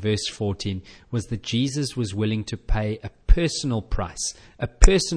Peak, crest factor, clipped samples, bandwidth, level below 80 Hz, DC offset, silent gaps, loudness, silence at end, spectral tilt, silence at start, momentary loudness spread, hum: 0 dBFS; 22 dB; under 0.1%; 10.5 kHz; -24 dBFS; under 0.1%; none; -26 LUFS; 0 s; -5 dB/octave; 0 s; 10 LU; none